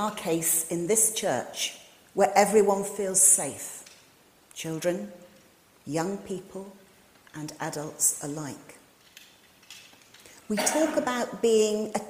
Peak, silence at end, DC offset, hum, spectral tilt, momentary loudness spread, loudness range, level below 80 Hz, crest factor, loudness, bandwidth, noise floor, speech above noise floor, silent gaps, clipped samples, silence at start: -6 dBFS; 0 s; under 0.1%; none; -2.5 dB/octave; 22 LU; 12 LU; -68 dBFS; 22 dB; -25 LUFS; 16 kHz; -58 dBFS; 32 dB; none; under 0.1%; 0 s